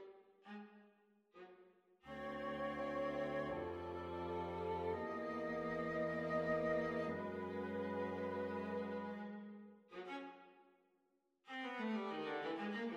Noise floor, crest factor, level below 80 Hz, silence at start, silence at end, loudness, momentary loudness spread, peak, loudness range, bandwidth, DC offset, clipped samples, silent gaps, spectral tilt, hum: -82 dBFS; 18 dB; -70 dBFS; 0 s; 0 s; -44 LUFS; 16 LU; -26 dBFS; 7 LU; 12 kHz; under 0.1%; under 0.1%; none; -7 dB/octave; none